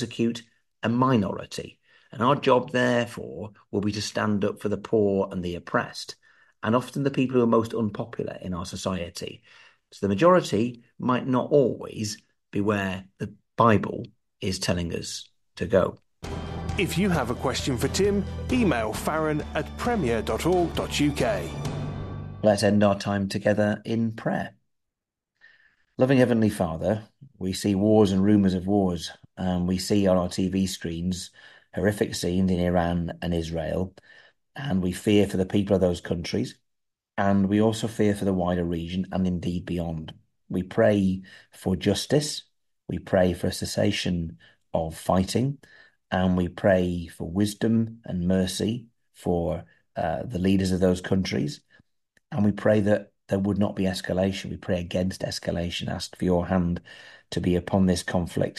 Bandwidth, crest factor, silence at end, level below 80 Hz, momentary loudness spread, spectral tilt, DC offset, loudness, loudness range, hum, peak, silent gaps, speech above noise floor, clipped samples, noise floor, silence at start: 13 kHz; 20 dB; 0.05 s; -48 dBFS; 13 LU; -6 dB/octave; under 0.1%; -25 LUFS; 3 LU; none; -6 dBFS; none; 61 dB; under 0.1%; -85 dBFS; 0 s